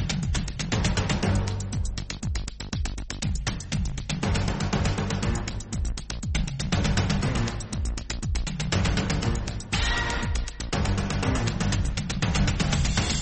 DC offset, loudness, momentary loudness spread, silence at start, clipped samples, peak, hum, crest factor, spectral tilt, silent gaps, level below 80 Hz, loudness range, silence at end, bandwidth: under 0.1%; -28 LUFS; 7 LU; 0 s; under 0.1%; -12 dBFS; none; 16 dB; -4.5 dB/octave; none; -32 dBFS; 3 LU; 0 s; 8.8 kHz